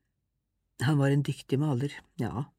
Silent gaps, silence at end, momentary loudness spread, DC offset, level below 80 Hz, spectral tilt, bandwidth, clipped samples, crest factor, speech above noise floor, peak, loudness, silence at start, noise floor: none; 0.15 s; 10 LU; under 0.1%; -62 dBFS; -7 dB/octave; 14 kHz; under 0.1%; 16 dB; 52 dB; -14 dBFS; -29 LUFS; 0.8 s; -80 dBFS